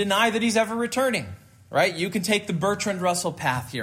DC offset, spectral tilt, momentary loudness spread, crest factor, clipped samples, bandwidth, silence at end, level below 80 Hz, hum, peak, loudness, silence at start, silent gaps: under 0.1%; -4 dB/octave; 6 LU; 16 dB; under 0.1%; 16 kHz; 0 s; -62 dBFS; none; -8 dBFS; -24 LUFS; 0 s; none